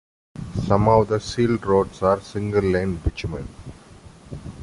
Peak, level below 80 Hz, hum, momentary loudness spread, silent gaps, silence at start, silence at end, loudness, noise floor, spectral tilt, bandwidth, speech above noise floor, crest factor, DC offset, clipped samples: -2 dBFS; -38 dBFS; none; 21 LU; none; 0.35 s; 0 s; -21 LUFS; -45 dBFS; -7 dB/octave; 11.5 kHz; 25 dB; 20 dB; under 0.1%; under 0.1%